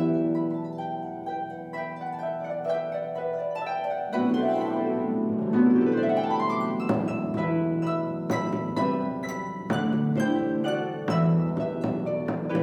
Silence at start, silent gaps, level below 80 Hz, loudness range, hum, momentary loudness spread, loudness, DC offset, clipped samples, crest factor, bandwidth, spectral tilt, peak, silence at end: 0 s; none; -64 dBFS; 6 LU; none; 10 LU; -27 LUFS; under 0.1%; under 0.1%; 16 dB; 10.5 kHz; -8 dB/octave; -10 dBFS; 0 s